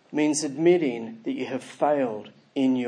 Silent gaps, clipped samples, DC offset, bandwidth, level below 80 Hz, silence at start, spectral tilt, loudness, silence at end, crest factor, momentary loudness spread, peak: none; under 0.1%; under 0.1%; 10.5 kHz; -82 dBFS; 0.1 s; -5 dB/octave; -25 LUFS; 0 s; 16 dB; 12 LU; -8 dBFS